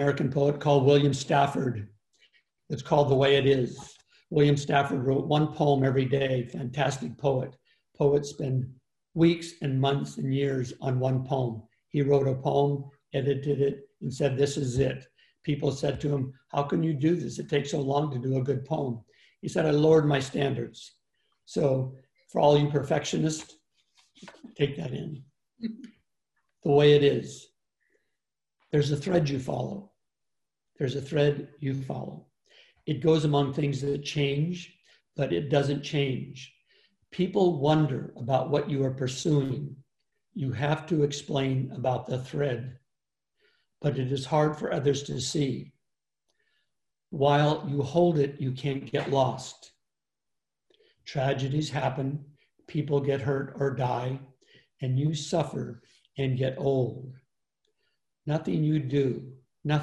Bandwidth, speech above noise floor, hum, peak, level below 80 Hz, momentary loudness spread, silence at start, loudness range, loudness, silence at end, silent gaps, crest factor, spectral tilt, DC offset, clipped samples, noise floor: 11.5 kHz; 62 dB; none; -8 dBFS; -60 dBFS; 15 LU; 0 s; 5 LU; -27 LUFS; 0 s; none; 20 dB; -6.5 dB/octave; under 0.1%; under 0.1%; -88 dBFS